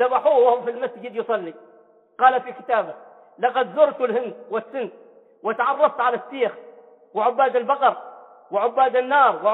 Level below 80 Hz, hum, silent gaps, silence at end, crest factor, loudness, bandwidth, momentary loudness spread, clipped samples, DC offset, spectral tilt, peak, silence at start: -78 dBFS; none; none; 0 s; 18 dB; -21 LUFS; 4.1 kHz; 13 LU; under 0.1%; under 0.1%; -7 dB/octave; -4 dBFS; 0 s